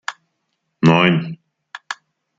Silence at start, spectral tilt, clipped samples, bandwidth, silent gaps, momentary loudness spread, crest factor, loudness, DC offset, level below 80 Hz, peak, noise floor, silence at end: 0.1 s; -6.5 dB/octave; under 0.1%; 7.8 kHz; none; 25 LU; 20 dB; -15 LUFS; under 0.1%; -58 dBFS; 0 dBFS; -73 dBFS; 0.45 s